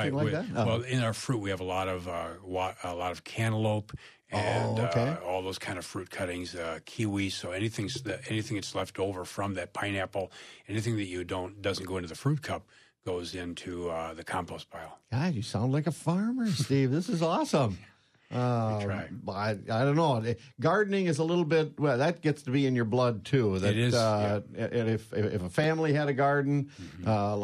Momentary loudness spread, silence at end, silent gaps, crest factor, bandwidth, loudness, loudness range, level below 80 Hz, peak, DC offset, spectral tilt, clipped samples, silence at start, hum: 10 LU; 0 s; none; 16 dB; 13 kHz; -31 LUFS; 7 LU; -62 dBFS; -14 dBFS; under 0.1%; -6 dB/octave; under 0.1%; 0 s; none